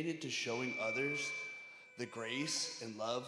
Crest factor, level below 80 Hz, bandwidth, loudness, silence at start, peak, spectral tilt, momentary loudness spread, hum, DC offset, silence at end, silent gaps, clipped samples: 16 dB; under -90 dBFS; 13.5 kHz; -39 LUFS; 0 s; -24 dBFS; -3 dB/octave; 10 LU; none; under 0.1%; 0 s; none; under 0.1%